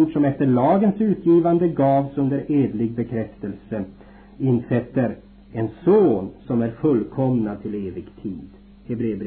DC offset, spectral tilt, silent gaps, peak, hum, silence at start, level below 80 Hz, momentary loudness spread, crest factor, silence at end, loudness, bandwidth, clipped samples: under 0.1%; -13 dB/octave; none; -8 dBFS; none; 0 s; -50 dBFS; 16 LU; 14 dB; 0 s; -21 LUFS; 4.3 kHz; under 0.1%